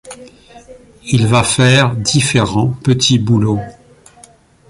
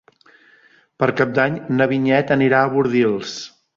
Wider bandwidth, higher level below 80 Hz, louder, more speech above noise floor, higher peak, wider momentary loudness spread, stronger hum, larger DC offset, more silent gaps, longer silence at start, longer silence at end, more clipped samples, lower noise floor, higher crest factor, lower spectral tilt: first, 11.5 kHz vs 7.4 kHz; first, -42 dBFS vs -58 dBFS; first, -13 LUFS vs -18 LUFS; second, 32 dB vs 36 dB; about the same, 0 dBFS vs -2 dBFS; first, 11 LU vs 8 LU; neither; neither; neither; second, 0.05 s vs 1 s; first, 1 s vs 0.3 s; neither; second, -45 dBFS vs -54 dBFS; about the same, 14 dB vs 18 dB; second, -4.5 dB/octave vs -6.5 dB/octave